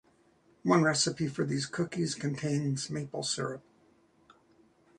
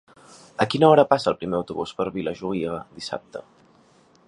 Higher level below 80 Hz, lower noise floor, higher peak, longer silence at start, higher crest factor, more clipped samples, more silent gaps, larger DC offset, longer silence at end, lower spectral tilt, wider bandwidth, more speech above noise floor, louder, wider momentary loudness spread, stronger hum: second, -68 dBFS vs -58 dBFS; first, -66 dBFS vs -57 dBFS; second, -10 dBFS vs -2 dBFS; about the same, 0.65 s vs 0.6 s; about the same, 22 dB vs 22 dB; neither; neither; neither; first, 1.4 s vs 0.85 s; second, -4.5 dB/octave vs -6 dB/octave; about the same, 11 kHz vs 11 kHz; about the same, 35 dB vs 34 dB; second, -31 LUFS vs -22 LUFS; second, 10 LU vs 18 LU; neither